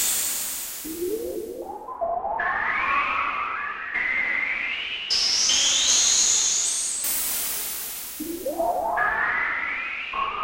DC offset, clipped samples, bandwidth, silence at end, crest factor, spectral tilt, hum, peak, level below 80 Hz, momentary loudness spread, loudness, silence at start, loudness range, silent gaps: under 0.1%; under 0.1%; 16 kHz; 0 s; 18 dB; 1 dB/octave; none; -8 dBFS; -54 dBFS; 13 LU; -22 LUFS; 0 s; 6 LU; none